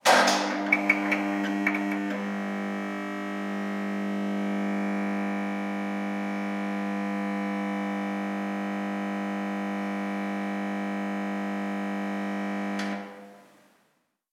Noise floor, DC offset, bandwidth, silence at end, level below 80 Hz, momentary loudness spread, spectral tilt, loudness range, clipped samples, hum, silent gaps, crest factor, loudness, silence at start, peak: -71 dBFS; under 0.1%; 15.5 kHz; 0.9 s; -90 dBFS; 7 LU; -5 dB/octave; 4 LU; under 0.1%; none; none; 24 dB; -29 LUFS; 0.05 s; -6 dBFS